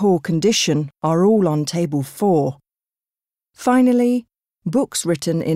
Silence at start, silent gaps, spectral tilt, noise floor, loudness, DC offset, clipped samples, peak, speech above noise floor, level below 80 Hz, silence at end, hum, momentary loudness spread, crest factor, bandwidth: 0 s; none; -5.5 dB/octave; under -90 dBFS; -18 LUFS; under 0.1%; under 0.1%; -6 dBFS; over 73 dB; -60 dBFS; 0 s; none; 8 LU; 12 dB; 16 kHz